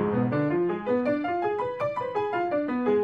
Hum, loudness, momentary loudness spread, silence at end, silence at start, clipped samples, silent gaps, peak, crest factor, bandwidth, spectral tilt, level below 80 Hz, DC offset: none; -27 LUFS; 3 LU; 0 s; 0 s; under 0.1%; none; -12 dBFS; 14 dB; 7.6 kHz; -9 dB/octave; -62 dBFS; under 0.1%